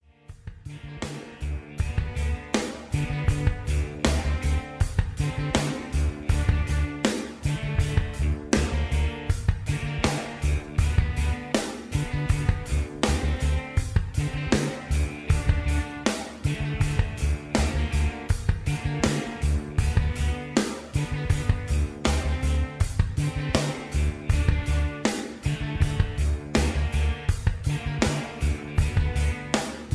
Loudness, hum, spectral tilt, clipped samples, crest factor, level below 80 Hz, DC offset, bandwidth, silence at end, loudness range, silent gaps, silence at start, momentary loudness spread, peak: -27 LUFS; none; -5.5 dB/octave; under 0.1%; 22 dB; -28 dBFS; under 0.1%; 11 kHz; 0 s; 1 LU; none; 0.3 s; 5 LU; -2 dBFS